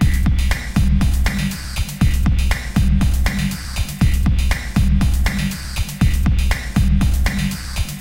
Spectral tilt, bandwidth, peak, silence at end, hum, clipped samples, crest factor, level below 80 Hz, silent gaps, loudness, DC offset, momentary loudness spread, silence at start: -5.5 dB/octave; 16.5 kHz; -2 dBFS; 0 s; none; under 0.1%; 14 dB; -18 dBFS; none; -19 LUFS; under 0.1%; 7 LU; 0 s